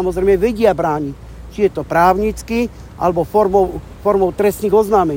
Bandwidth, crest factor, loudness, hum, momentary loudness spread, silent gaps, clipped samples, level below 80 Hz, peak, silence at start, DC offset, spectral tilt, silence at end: 16.5 kHz; 14 dB; -16 LUFS; none; 8 LU; none; under 0.1%; -34 dBFS; 0 dBFS; 0 s; under 0.1%; -6.5 dB/octave; 0 s